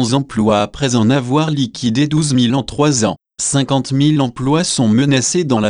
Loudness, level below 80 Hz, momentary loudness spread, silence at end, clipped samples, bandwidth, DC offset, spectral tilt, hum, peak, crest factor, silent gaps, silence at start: -15 LUFS; -44 dBFS; 4 LU; 0 s; under 0.1%; 10.5 kHz; 0.1%; -5 dB/octave; none; -2 dBFS; 12 dB; none; 0 s